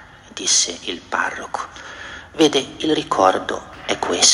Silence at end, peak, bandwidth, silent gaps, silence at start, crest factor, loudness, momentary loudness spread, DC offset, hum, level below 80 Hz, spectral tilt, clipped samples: 0 s; 0 dBFS; 12 kHz; none; 0 s; 20 dB; -19 LUFS; 17 LU; under 0.1%; none; -54 dBFS; -1 dB/octave; under 0.1%